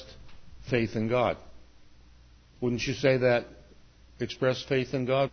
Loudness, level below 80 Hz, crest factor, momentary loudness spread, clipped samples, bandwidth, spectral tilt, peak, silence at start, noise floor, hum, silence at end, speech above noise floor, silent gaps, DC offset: -28 LUFS; -54 dBFS; 20 dB; 14 LU; under 0.1%; 6.6 kHz; -6 dB/octave; -10 dBFS; 0 s; -55 dBFS; none; 0.05 s; 28 dB; none; under 0.1%